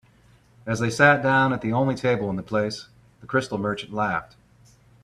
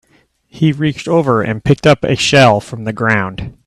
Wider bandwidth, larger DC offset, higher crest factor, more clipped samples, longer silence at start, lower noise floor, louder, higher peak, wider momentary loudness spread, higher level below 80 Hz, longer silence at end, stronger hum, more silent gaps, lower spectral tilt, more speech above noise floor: about the same, 13 kHz vs 12.5 kHz; neither; first, 22 dB vs 14 dB; neither; about the same, 0.65 s vs 0.55 s; about the same, -56 dBFS vs -54 dBFS; second, -23 LUFS vs -13 LUFS; about the same, -2 dBFS vs 0 dBFS; first, 13 LU vs 9 LU; second, -56 dBFS vs -40 dBFS; first, 0.8 s vs 0.15 s; neither; neither; about the same, -6 dB/octave vs -5.5 dB/octave; second, 34 dB vs 42 dB